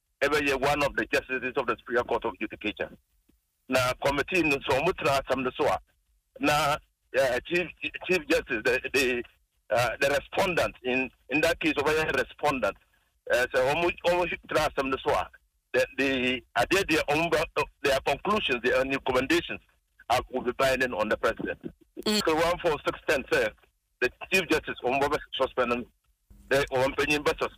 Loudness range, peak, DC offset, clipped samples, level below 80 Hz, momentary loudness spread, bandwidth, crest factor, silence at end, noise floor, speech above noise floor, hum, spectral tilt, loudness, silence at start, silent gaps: 2 LU; -12 dBFS; under 0.1%; under 0.1%; -52 dBFS; 7 LU; 15.5 kHz; 16 dB; 0.1 s; -69 dBFS; 42 dB; none; -4 dB/octave; -27 LUFS; 0.2 s; none